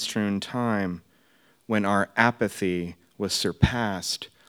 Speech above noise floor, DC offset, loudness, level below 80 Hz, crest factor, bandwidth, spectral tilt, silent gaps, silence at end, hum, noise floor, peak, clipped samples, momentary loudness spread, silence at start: 37 dB; under 0.1%; -26 LUFS; -46 dBFS; 24 dB; 18 kHz; -4.5 dB/octave; none; 0.2 s; none; -62 dBFS; -4 dBFS; under 0.1%; 10 LU; 0 s